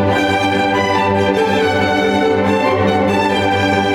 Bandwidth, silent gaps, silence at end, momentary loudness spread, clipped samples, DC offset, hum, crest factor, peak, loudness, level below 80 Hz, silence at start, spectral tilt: 17 kHz; none; 0 s; 0 LU; under 0.1%; under 0.1%; none; 12 dB; -2 dBFS; -14 LUFS; -44 dBFS; 0 s; -5.5 dB/octave